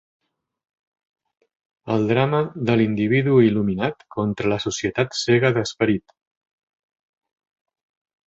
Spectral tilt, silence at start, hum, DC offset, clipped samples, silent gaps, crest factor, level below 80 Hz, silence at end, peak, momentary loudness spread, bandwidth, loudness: -6 dB/octave; 1.85 s; none; under 0.1%; under 0.1%; none; 20 dB; -54 dBFS; 2.3 s; -2 dBFS; 9 LU; 8.2 kHz; -21 LUFS